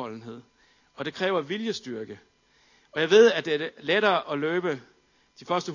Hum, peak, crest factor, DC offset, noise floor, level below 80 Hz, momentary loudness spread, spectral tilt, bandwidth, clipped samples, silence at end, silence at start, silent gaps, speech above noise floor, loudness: none; -6 dBFS; 22 dB; under 0.1%; -62 dBFS; -74 dBFS; 19 LU; -4.5 dB/octave; 7.4 kHz; under 0.1%; 0 s; 0 s; none; 37 dB; -25 LUFS